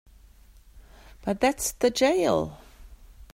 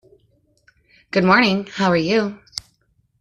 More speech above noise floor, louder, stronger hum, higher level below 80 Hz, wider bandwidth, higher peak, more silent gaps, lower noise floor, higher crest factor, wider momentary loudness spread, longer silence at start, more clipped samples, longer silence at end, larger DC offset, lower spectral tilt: second, 29 dB vs 47 dB; second, -25 LUFS vs -18 LUFS; neither; first, -50 dBFS vs -56 dBFS; first, 16 kHz vs 11 kHz; second, -10 dBFS vs -2 dBFS; neither; second, -53 dBFS vs -64 dBFS; about the same, 18 dB vs 18 dB; second, 12 LU vs 18 LU; second, 0.75 s vs 1.15 s; neither; second, 0.1 s vs 0.6 s; neither; second, -3.5 dB/octave vs -5.5 dB/octave